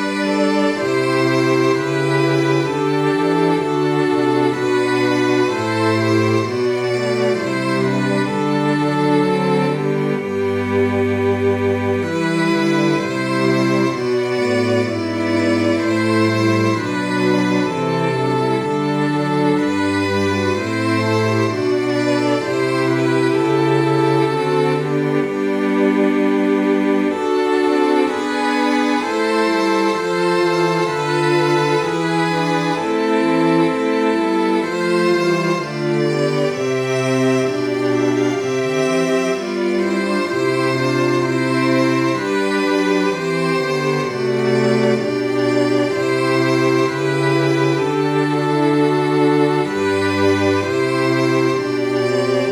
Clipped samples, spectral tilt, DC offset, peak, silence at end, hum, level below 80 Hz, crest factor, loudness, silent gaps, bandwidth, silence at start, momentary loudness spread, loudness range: under 0.1%; -6 dB/octave; under 0.1%; -4 dBFS; 0 s; none; -60 dBFS; 14 dB; -17 LUFS; none; 19.5 kHz; 0 s; 3 LU; 1 LU